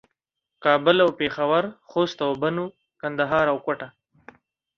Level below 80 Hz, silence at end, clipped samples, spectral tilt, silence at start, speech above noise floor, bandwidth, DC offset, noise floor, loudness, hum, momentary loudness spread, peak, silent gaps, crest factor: -62 dBFS; 0.9 s; under 0.1%; -6 dB/octave; 0.6 s; 58 dB; 7 kHz; under 0.1%; -81 dBFS; -23 LUFS; none; 13 LU; -4 dBFS; none; 20 dB